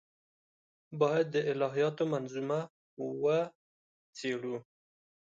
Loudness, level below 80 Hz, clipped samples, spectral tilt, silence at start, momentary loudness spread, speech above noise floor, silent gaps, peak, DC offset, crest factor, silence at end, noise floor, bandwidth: -33 LUFS; -82 dBFS; under 0.1%; -6.5 dB/octave; 0.9 s; 12 LU; over 58 dB; 2.70-2.97 s, 3.55-4.13 s; -14 dBFS; under 0.1%; 20 dB; 0.7 s; under -90 dBFS; 7.8 kHz